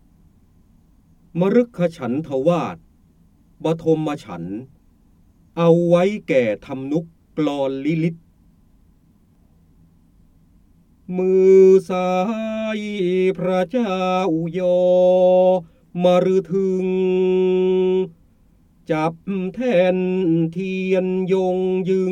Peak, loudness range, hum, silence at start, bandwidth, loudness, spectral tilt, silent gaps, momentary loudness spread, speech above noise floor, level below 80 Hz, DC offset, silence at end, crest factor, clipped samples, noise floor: -2 dBFS; 9 LU; none; 1.35 s; 9 kHz; -19 LUFS; -8 dB/octave; none; 11 LU; 37 dB; -56 dBFS; under 0.1%; 0 s; 18 dB; under 0.1%; -55 dBFS